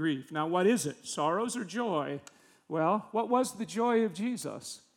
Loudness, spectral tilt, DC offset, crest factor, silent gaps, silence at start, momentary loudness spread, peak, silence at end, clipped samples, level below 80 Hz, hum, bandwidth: -31 LUFS; -4.5 dB/octave; under 0.1%; 16 dB; none; 0 s; 10 LU; -14 dBFS; 0.2 s; under 0.1%; -84 dBFS; none; 19 kHz